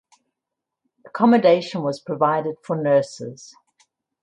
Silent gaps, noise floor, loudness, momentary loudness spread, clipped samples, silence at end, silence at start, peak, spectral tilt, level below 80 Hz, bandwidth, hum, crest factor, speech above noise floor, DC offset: none; -84 dBFS; -20 LUFS; 18 LU; under 0.1%; 0.75 s; 1.05 s; -2 dBFS; -6.5 dB/octave; -70 dBFS; 9.8 kHz; none; 20 dB; 64 dB; under 0.1%